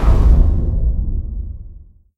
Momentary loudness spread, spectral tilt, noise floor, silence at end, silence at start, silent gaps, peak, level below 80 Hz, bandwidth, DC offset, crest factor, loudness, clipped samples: 17 LU; -9.5 dB/octave; -39 dBFS; 0.35 s; 0 s; none; 0 dBFS; -16 dBFS; 4 kHz; under 0.1%; 14 dB; -18 LUFS; under 0.1%